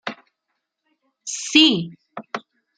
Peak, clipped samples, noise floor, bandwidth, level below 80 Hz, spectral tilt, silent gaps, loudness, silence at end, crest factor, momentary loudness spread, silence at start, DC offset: -2 dBFS; under 0.1%; -78 dBFS; 9.4 kHz; -70 dBFS; -2.5 dB/octave; none; -17 LUFS; 0.4 s; 22 dB; 21 LU; 0.05 s; under 0.1%